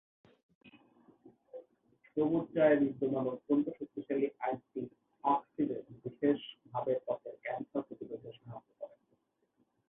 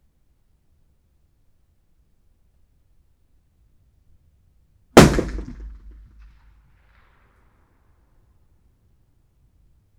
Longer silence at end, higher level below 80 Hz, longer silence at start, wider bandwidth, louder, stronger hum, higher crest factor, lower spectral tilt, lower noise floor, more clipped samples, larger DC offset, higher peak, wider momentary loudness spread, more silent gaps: second, 1 s vs 4.3 s; second, -76 dBFS vs -38 dBFS; second, 0.65 s vs 4.95 s; second, 3.8 kHz vs over 20 kHz; second, -35 LUFS vs -16 LUFS; neither; second, 20 dB vs 26 dB; first, -10 dB/octave vs -5.5 dB/octave; first, -77 dBFS vs -62 dBFS; neither; neither; second, -16 dBFS vs 0 dBFS; second, 21 LU vs 29 LU; neither